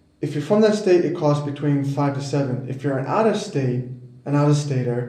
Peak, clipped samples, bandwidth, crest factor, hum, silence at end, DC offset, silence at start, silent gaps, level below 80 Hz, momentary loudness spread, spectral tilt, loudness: -4 dBFS; under 0.1%; 10 kHz; 16 dB; none; 0 s; under 0.1%; 0.2 s; none; -64 dBFS; 9 LU; -7 dB/octave; -21 LUFS